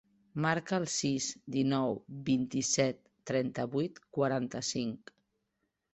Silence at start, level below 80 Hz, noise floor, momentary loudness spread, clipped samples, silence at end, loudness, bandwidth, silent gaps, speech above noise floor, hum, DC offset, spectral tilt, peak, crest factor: 0.35 s; -70 dBFS; -82 dBFS; 7 LU; under 0.1%; 0.95 s; -33 LUFS; 8.4 kHz; none; 50 dB; none; under 0.1%; -4.5 dB/octave; -14 dBFS; 20 dB